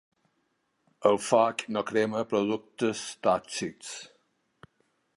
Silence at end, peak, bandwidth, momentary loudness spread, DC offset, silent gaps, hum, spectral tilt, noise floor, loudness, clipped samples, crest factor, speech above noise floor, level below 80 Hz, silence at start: 1.1 s; -8 dBFS; 11.5 kHz; 12 LU; under 0.1%; none; none; -4 dB/octave; -75 dBFS; -28 LUFS; under 0.1%; 22 dB; 47 dB; -70 dBFS; 1 s